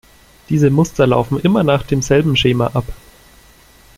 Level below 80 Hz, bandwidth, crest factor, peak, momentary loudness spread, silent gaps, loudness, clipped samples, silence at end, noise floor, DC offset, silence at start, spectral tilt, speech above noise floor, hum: -36 dBFS; 15.5 kHz; 16 dB; 0 dBFS; 7 LU; none; -15 LUFS; under 0.1%; 1.05 s; -46 dBFS; under 0.1%; 0.5 s; -6 dB/octave; 32 dB; none